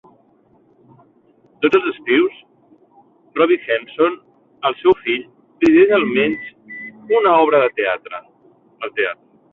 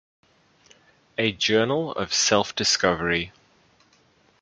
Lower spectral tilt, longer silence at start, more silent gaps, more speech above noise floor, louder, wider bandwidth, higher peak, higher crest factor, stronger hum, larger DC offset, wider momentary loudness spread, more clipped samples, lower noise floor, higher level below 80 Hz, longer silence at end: first, -6.5 dB/octave vs -2.5 dB/octave; first, 1.6 s vs 1.2 s; neither; about the same, 39 dB vs 38 dB; first, -17 LUFS vs -22 LUFS; second, 6.8 kHz vs 10 kHz; about the same, -2 dBFS vs -4 dBFS; second, 16 dB vs 22 dB; neither; neither; first, 20 LU vs 7 LU; neither; second, -55 dBFS vs -61 dBFS; about the same, -58 dBFS vs -54 dBFS; second, 0.4 s vs 1.1 s